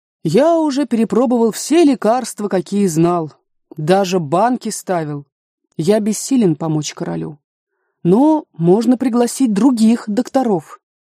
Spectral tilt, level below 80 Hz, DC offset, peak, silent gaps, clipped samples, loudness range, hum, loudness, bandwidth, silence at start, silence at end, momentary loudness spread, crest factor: -6 dB/octave; -62 dBFS; under 0.1%; 0 dBFS; 5.32-5.58 s, 7.44-7.67 s; under 0.1%; 4 LU; none; -16 LUFS; 15.5 kHz; 0.25 s; 0.4 s; 10 LU; 14 dB